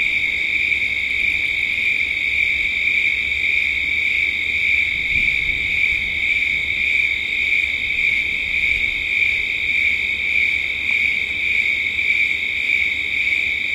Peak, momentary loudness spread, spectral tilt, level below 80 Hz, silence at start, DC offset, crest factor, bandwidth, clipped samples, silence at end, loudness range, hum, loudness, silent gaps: -6 dBFS; 2 LU; -1.5 dB/octave; -42 dBFS; 0 s; under 0.1%; 14 dB; 16 kHz; under 0.1%; 0 s; 0 LU; none; -17 LUFS; none